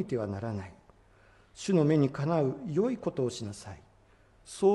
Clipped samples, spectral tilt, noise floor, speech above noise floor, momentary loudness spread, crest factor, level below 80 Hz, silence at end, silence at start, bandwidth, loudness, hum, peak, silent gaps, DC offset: under 0.1%; -7 dB/octave; -61 dBFS; 32 dB; 20 LU; 16 dB; -64 dBFS; 0 s; 0 s; 11.5 kHz; -30 LUFS; none; -14 dBFS; none; under 0.1%